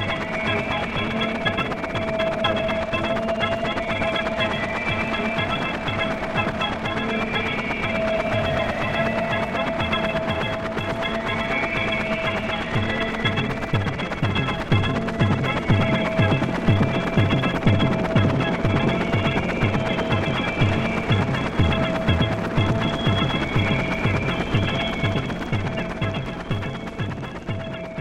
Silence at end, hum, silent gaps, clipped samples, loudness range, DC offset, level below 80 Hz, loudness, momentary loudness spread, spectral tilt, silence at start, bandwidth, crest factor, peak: 0 s; none; none; under 0.1%; 3 LU; under 0.1%; -38 dBFS; -23 LUFS; 5 LU; -6.5 dB/octave; 0 s; 11.5 kHz; 16 dB; -6 dBFS